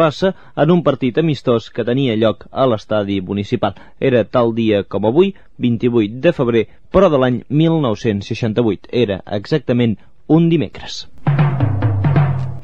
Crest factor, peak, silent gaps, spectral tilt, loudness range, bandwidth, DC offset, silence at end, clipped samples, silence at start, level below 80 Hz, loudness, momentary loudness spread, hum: 16 dB; 0 dBFS; none; -8 dB/octave; 2 LU; 7.8 kHz; 1%; 0 s; under 0.1%; 0 s; -44 dBFS; -16 LUFS; 6 LU; none